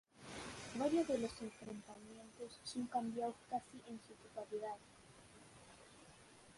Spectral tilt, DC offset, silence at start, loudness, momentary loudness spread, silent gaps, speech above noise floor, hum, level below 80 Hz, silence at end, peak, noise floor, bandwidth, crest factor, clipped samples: -4.5 dB/octave; under 0.1%; 0.15 s; -45 LUFS; 23 LU; none; 19 dB; none; -74 dBFS; 0 s; -26 dBFS; -63 dBFS; 11.5 kHz; 20 dB; under 0.1%